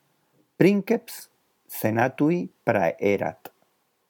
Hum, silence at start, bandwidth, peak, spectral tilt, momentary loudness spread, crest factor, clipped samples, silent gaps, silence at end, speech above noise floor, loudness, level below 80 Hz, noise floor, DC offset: none; 0.6 s; 19.5 kHz; -4 dBFS; -7 dB/octave; 13 LU; 22 dB; under 0.1%; none; 0.75 s; 45 dB; -24 LUFS; -70 dBFS; -69 dBFS; under 0.1%